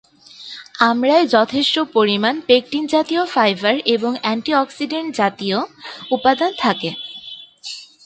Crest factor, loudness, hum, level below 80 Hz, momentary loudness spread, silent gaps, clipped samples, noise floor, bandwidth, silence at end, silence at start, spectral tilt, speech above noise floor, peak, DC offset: 18 dB; -17 LUFS; none; -64 dBFS; 17 LU; none; under 0.1%; -39 dBFS; 9.2 kHz; 0.2 s; 0.4 s; -4.5 dB/octave; 21 dB; 0 dBFS; under 0.1%